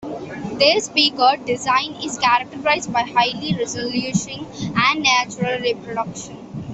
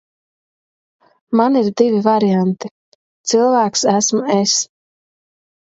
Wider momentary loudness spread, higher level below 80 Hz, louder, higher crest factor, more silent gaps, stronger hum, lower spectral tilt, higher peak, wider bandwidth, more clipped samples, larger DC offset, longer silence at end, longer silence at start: first, 14 LU vs 10 LU; first, -54 dBFS vs -66 dBFS; second, -19 LUFS vs -15 LUFS; about the same, 18 dB vs 18 dB; second, none vs 2.71-3.24 s; neither; about the same, -3 dB/octave vs -4 dB/octave; about the same, -2 dBFS vs 0 dBFS; about the same, 8.4 kHz vs 8 kHz; neither; neither; second, 0 s vs 1.1 s; second, 0 s vs 1.3 s